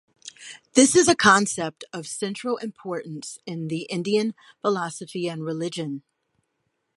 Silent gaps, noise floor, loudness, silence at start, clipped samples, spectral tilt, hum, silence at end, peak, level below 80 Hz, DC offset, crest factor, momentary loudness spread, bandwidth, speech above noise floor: none; -76 dBFS; -23 LUFS; 0.25 s; under 0.1%; -3.5 dB/octave; none; 0.95 s; -2 dBFS; -64 dBFS; under 0.1%; 22 dB; 19 LU; 11.5 kHz; 52 dB